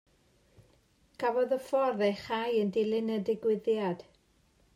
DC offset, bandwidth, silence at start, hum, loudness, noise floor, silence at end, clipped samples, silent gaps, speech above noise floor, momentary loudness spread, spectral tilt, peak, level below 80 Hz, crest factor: under 0.1%; 13.5 kHz; 1.2 s; none; -31 LUFS; -67 dBFS; 0.75 s; under 0.1%; none; 38 dB; 5 LU; -6.5 dB/octave; -16 dBFS; -70 dBFS; 16 dB